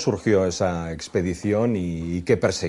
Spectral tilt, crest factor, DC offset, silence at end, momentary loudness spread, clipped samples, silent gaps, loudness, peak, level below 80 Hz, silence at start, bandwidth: -6 dB/octave; 16 dB; under 0.1%; 0 s; 6 LU; under 0.1%; none; -23 LUFS; -6 dBFS; -50 dBFS; 0 s; 11.5 kHz